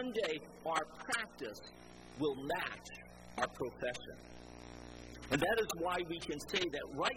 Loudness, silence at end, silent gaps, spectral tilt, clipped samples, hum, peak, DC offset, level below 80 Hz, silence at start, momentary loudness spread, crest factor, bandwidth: -39 LUFS; 0 s; none; -3.5 dB/octave; under 0.1%; none; -18 dBFS; under 0.1%; -62 dBFS; 0 s; 17 LU; 22 dB; 16 kHz